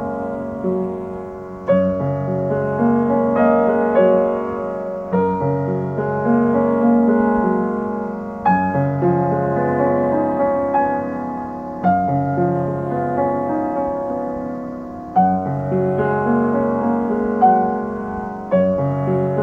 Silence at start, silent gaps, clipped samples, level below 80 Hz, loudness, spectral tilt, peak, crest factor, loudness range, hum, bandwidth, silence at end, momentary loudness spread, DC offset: 0 s; none; under 0.1%; -48 dBFS; -19 LUFS; -10.5 dB/octave; -2 dBFS; 16 dB; 3 LU; none; 3.8 kHz; 0 s; 10 LU; under 0.1%